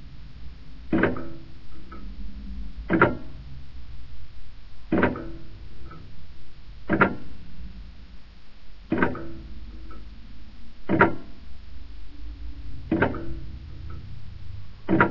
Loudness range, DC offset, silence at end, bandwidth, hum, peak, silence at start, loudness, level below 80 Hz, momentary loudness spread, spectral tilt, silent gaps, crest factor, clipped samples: 5 LU; under 0.1%; 0 s; 6 kHz; none; -2 dBFS; 0 s; -26 LUFS; -42 dBFS; 25 LU; -9 dB/octave; none; 26 dB; under 0.1%